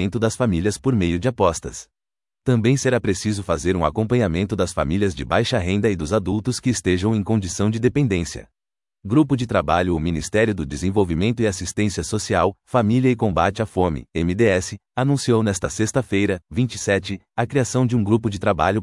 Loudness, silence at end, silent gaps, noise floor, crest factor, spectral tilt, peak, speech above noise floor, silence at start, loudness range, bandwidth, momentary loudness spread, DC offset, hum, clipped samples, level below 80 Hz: -21 LUFS; 0 s; none; -87 dBFS; 18 dB; -6 dB/octave; -2 dBFS; 67 dB; 0 s; 1 LU; 12 kHz; 5 LU; under 0.1%; none; under 0.1%; -44 dBFS